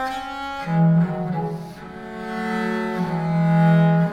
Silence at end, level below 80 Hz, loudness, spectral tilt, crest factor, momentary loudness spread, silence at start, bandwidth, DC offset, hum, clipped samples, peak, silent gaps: 0 s; -52 dBFS; -21 LUFS; -8.5 dB/octave; 14 dB; 17 LU; 0 s; 7 kHz; under 0.1%; none; under 0.1%; -6 dBFS; none